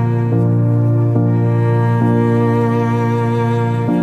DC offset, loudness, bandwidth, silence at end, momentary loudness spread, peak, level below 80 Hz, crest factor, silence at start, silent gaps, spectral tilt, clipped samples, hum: under 0.1%; -15 LUFS; 4.2 kHz; 0 s; 2 LU; -4 dBFS; -54 dBFS; 10 dB; 0 s; none; -10 dB/octave; under 0.1%; none